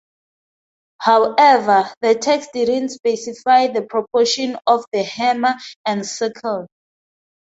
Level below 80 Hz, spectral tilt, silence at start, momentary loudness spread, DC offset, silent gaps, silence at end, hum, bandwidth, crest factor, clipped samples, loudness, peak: -66 dBFS; -3 dB/octave; 1 s; 11 LU; under 0.1%; 1.97-2.01 s, 5.76-5.84 s; 0.9 s; none; 8 kHz; 16 dB; under 0.1%; -17 LUFS; -2 dBFS